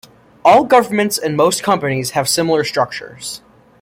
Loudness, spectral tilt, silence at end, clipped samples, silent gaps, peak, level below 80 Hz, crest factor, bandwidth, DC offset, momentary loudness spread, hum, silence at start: -15 LUFS; -4 dB/octave; 0.45 s; under 0.1%; none; 0 dBFS; -56 dBFS; 14 dB; 16.5 kHz; under 0.1%; 16 LU; none; 0.45 s